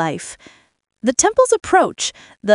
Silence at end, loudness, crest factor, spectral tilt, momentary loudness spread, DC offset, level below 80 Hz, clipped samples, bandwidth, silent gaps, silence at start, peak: 0 s; -17 LUFS; 18 dB; -2.5 dB/octave; 14 LU; under 0.1%; -52 dBFS; under 0.1%; 11.5 kHz; none; 0 s; 0 dBFS